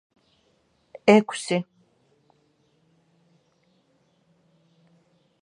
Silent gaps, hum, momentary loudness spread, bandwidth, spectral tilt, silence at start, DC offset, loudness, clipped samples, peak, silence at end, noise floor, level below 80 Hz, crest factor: none; none; 12 LU; 10.5 kHz; -5.5 dB/octave; 1.05 s; under 0.1%; -21 LUFS; under 0.1%; -2 dBFS; 3.8 s; -66 dBFS; -78 dBFS; 28 dB